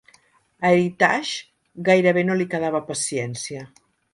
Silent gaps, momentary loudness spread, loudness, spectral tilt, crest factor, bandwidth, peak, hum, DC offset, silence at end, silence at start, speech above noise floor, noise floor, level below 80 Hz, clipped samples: none; 14 LU; -21 LUFS; -4.5 dB/octave; 20 dB; 11.5 kHz; -4 dBFS; none; under 0.1%; 0.45 s; 0.6 s; 38 dB; -59 dBFS; -66 dBFS; under 0.1%